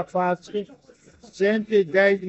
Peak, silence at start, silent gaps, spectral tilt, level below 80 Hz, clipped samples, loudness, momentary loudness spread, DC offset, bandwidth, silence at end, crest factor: -6 dBFS; 0 s; none; -6.5 dB/octave; -66 dBFS; under 0.1%; -23 LUFS; 13 LU; under 0.1%; 8.2 kHz; 0 s; 18 dB